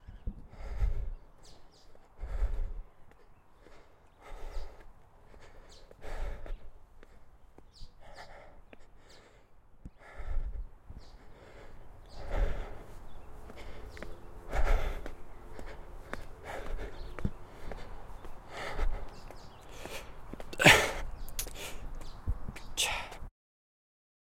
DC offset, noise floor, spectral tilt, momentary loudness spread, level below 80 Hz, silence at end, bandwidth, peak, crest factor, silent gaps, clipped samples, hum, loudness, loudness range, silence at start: under 0.1%; -57 dBFS; -3 dB/octave; 20 LU; -40 dBFS; 1 s; 16.5 kHz; -6 dBFS; 30 dB; none; under 0.1%; none; -34 LUFS; 22 LU; 0 s